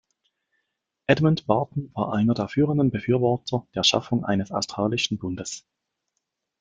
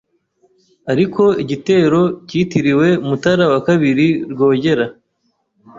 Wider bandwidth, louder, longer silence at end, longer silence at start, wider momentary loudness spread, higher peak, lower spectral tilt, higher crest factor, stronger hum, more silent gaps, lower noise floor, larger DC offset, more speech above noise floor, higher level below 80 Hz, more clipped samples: first, 9.4 kHz vs 7.6 kHz; second, -24 LUFS vs -15 LUFS; first, 1 s vs 0 s; first, 1.1 s vs 0.85 s; first, 10 LU vs 6 LU; about the same, -2 dBFS vs -2 dBFS; second, -5 dB/octave vs -7 dB/octave; first, 22 dB vs 14 dB; neither; neither; first, -80 dBFS vs -66 dBFS; neither; first, 57 dB vs 52 dB; about the same, -56 dBFS vs -54 dBFS; neither